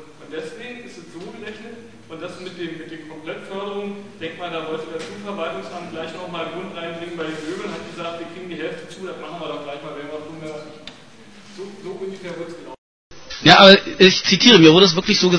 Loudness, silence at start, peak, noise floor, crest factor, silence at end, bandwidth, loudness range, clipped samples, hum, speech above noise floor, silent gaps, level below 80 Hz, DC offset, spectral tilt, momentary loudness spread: -14 LUFS; 0 s; 0 dBFS; -45 dBFS; 20 dB; 0 s; 10.5 kHz; 20 LU; under 0.1%; none; 26 dB; 12.78-13.10 s; -56 dBFS; 0.4%; -4 dB/octave; 25 LU